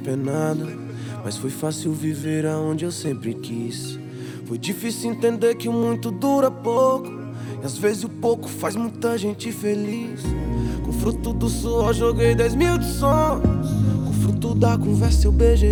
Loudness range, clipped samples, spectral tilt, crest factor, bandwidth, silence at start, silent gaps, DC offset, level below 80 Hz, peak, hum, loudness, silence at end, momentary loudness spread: 6 LU; under 0.1%; -6.5 dB/octave; 16 dB; 20 kHz; 0 s; none; under 0.1%; -28 dBFS; -4 dBFS; none; -22 LUFS; 0 s; 11 LU